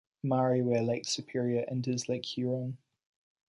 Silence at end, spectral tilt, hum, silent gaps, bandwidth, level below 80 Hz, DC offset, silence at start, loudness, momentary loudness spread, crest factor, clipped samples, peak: 0.7 s; -5.5 dB/octave; none; none; 11 kHz; -72 dBFS; under 0.1%; 0.25 s; -32 LUFS; 7 LU; 16 dB; under 0.1%; -16 dBFS